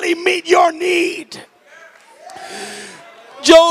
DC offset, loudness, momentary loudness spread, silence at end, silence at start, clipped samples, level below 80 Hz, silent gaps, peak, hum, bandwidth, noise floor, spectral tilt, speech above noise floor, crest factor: under 0.1%; -14 LUFS; 24 LU; 0 s; 0 s; under 0.1%; -54 dBFS; none; 0 dBFS; none; 14.5 kHz; -44 dBFS; -1.5 dB/octave; 30 dB; 16 dB